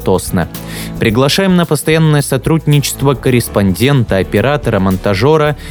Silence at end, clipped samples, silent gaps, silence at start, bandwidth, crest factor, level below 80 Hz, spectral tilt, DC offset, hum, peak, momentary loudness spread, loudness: 0 s; under 0.1%; none; 0 s; over 20 kHz; 12 dB; -32 dBFS; -5.5 dB/octave; under 0.1%; none; 0 dBFS; 5 LU; -12 LUFS